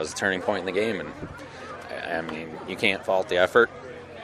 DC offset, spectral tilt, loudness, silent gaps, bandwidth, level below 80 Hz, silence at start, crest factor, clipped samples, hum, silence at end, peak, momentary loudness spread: under 0.1%; -4 dB/octave; -25 LUFS; none; 14 kHz; -58 dBFS; 0 s; 22 dB; under 0.1%; none; 0 s; -4 dBFS; 18 LU